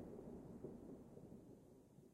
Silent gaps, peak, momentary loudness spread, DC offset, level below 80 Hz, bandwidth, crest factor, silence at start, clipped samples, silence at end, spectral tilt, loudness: none; -40 dBFS; 10 LU; under 0.1%; -72 dBFS; 14.5 kHz; 18 dB; 0 s; under 0.1%; 0 s; -8.5 dB/octave; -59 LUFS